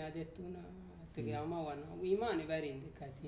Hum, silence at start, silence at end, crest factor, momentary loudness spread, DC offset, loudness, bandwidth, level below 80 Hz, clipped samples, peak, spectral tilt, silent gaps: none; 0 s; 0 s; 18 dB; 14 LU; under 0.1%; -42 LUFS; 4 kHz; -62 dBFS; under 0.1%; -24 dBFS; -6 dB/octave; none